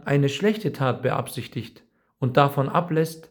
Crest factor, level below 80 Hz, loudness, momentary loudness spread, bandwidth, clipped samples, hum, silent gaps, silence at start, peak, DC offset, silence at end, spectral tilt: 20 dB; -64 dBFS; -23 LUFS; 13 LU; over 20 kHz; under 0.1%; none; none; 0.05 s; -2 dBFS; under 0.1%; 0.1 s; -6.5 dB/octave